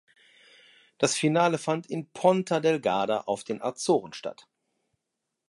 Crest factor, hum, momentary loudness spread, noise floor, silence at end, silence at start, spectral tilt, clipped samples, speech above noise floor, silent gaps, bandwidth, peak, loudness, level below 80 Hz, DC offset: 20 dB; none; 11 LU; -84 dBFS; 1.15 s; 1 s; -4.5 dB/octave; under 0.1%; 57 dB; none; 11.5 kHz; -8 dBFS; -26 LUFS; -76 dBFS; under 0.1%